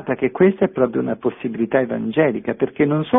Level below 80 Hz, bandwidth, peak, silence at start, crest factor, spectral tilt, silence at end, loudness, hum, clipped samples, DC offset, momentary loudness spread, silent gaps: -56 dBFS; 3.9 kHz; -2 dBFS; 0 s; 16 dB; -11.5 dB/octave; 0 s; -19 LUFS; none; under 0.1%; under 0.1%; 7 LU; none